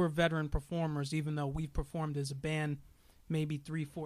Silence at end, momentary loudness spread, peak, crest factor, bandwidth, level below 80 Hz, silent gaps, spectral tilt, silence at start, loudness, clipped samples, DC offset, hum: 0 s; 7 LU; -18 dBFS; 18 dB; 13.5 kHz; -48 dBFS; none; -6.5 dB/octave; 0 s; -37 LUFS; under 0.1%; under 0.1%; none